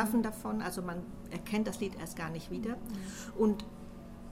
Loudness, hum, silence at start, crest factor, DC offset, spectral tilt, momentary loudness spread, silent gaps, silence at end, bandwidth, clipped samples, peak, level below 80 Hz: -36 LUFS; none; 0 s; 18 dB; under 0.1%; -5.5 dB/octave; 13 LU; none; 0 s; 16 kHz; under 0.1%; -16 dBFS; -52 dBFS